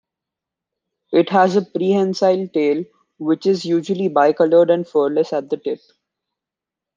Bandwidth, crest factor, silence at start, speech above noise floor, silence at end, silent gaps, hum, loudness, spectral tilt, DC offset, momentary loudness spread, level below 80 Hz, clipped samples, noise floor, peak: 7.6 kHz; 16 dB; 1.1 s; 69 dB; 1.2 s; none; none; -18 LUFS; -6.5 dB/octave; under 0.1%; 10 LU; -70 dBFS; under 0.1%; -86 dBFS; -2 dBFS